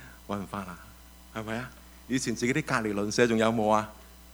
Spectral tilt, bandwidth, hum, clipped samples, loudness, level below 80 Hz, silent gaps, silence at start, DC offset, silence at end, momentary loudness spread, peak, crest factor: -5 dB/octave; over 20 kHz; none; under 0.1%; -29 LUFS; -54 dBFS; none; 0 s; under 0.1%; 0 s; 17 LU; -8 dBFS; 22 dB